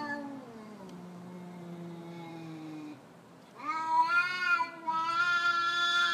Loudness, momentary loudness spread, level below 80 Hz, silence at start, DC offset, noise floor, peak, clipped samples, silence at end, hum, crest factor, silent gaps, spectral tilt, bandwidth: -29 LUFS; 20 LU; -84 dBFS; 0 s; under 0.1%; -54 dBFS; -16 dBFS; under 0.1%; 0 s; none; 16 dB; none; -3 dB/octave; 13.5 kHz